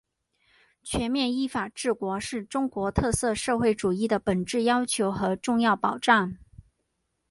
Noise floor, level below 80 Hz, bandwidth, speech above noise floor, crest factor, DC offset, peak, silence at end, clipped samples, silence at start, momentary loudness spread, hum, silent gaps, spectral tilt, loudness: -77 dBFS; -48 dBFS; 11.5 kHz; 52 dB; 22 dB; under 0.1%; -6 dBFS; 0.95 s; under 0.1%; 0.85 s; 7 LU; none; none; -4.5 dB/octave; -26 LUFS